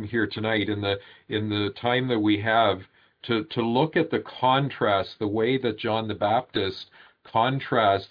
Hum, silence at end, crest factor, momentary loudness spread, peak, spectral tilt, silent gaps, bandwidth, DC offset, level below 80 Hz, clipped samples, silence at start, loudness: none; 0.05 s; 18 dB; 8 LU; -8 dBFS; -8.5 dB/octave; none; 5.2 kHz; under 0.1%; -64 dBFS; under 0.1%; 0 s; -25 LUFS